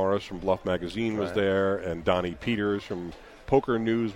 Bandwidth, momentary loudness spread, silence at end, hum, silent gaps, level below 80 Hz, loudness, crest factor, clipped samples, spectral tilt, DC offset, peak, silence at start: 15.5 kHz; 8 LU; 0 s; none; none; -50 dBFS; -28 LUFS; 20 dB; under 0.1%; -7 dB/octave; under 0.1%; -6 dBFS; 0 s